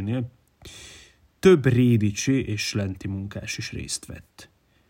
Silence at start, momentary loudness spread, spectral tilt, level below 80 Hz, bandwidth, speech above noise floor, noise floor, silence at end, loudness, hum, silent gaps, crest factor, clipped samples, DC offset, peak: 0 s; 24 LU; -5.5 dB/octave; -52 dBFS; 16 kHz; 29 dB; -52 dBFS; 0.45 s; -23 LUFS; none; none; 20 dB; under 0.1%; under 0.1%; -4 dBFS